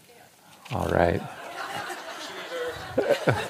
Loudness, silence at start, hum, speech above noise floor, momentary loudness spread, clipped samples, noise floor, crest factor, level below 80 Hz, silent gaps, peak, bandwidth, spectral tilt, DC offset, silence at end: -29 LUFS; 0.1 s; none; 29 dB; 12 LU; under 0.1%; -53 dBFS; 24 dB; -52 dBFS; none; -4 dBFS; 15.5 kHz; -5.5 dB/octave; under 0.1%; 0 s